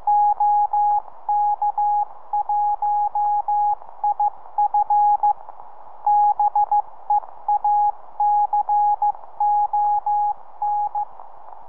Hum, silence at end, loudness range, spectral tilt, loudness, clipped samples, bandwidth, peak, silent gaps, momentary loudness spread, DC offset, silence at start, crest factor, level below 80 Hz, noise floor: none; 0.15 s; 1 LU; -7 dB/octave; -21 LUFS; under 0.1%; 1.9 kHz; -10 dBFS; none; 7 LU; 2%; 0.05 s; 10 dB; -76 dBFS; -43 dBFS